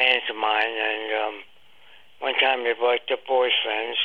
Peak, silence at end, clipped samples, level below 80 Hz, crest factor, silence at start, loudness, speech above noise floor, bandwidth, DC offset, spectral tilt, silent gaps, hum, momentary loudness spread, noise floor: -6 dBFS; 0 s; under 0.1%; -78 dBFS; 18 dB; 0 s; -23 LUFS; 31 dB; 5.6 kHz; 0.3%; -2.5 dB/octave; none; none; 7 LU; -54 dBFS